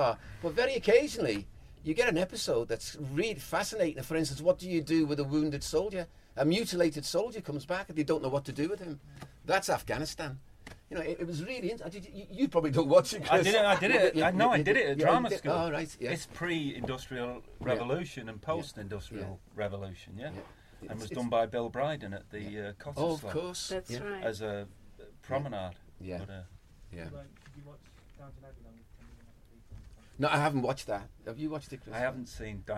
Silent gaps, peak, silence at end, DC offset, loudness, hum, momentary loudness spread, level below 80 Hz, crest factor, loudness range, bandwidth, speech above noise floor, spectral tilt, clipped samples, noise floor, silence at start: none; -10 dBFS; 0 s; under 0.1%; -32 LUFS; none; 18 LU; -56 dBFS; 22 dB; 14 LU; 16 kHz; 25 dB; -5 dB/octave; under 0.1%; -56 dBFS; 0 s